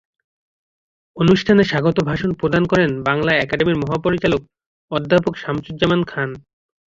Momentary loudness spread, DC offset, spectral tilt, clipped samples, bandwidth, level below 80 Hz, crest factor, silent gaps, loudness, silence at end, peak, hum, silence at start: 11 LU; under 0.1%; -7 dB/octave; under 0.1%; 7.6 kHz; -46 dBFS; 16 dB; 4.66-4.88 s; -18 LUFS; 0.5 s; -2 dBFS; none; 1.15 s